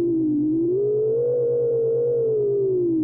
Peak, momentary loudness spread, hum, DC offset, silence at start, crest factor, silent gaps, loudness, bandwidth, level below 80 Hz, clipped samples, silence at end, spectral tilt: -16 dBFS; 0 LU; none; under 0.1%; 0 s; 6 dB; none; -21 LUFS; 1.5 kHz; -60 dBFS; under 0.1%; 0 s; -15.5 dB/octave